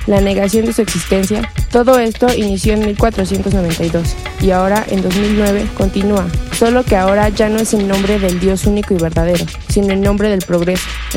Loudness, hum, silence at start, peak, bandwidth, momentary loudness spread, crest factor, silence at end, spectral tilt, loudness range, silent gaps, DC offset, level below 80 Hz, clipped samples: -14 LUFS; none; 0 s; 0 dBFS; 16.5 kHz; 5 LU; 14 dB; 0 s; -5.5 dB/octave; 1 LU; none; under 0.1%; -24 dBFS; under 0.1%